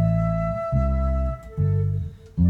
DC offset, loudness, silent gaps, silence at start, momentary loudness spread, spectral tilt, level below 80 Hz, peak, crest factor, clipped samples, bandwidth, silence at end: under 0.1%; -25 LUFS; none; 0 s; 7 LU; -11 dB/octave; -28 dBFS; -10 dBFS; 12 dB; under 0.1%; 4.5 kHz; 0 s